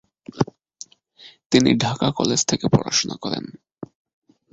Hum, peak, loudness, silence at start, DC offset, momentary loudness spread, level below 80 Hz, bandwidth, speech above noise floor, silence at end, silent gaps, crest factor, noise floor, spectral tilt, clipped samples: none; -2 dBFS; -21 LUFS; 0.35 s; under 0.1%; 23 LU; -50 dBFS; 8.2 kHz; 29 dB; 0.7 s; 1.46-1.50 s; 22 dB; -49 dBFS; -4 dB/octave; under 0.1%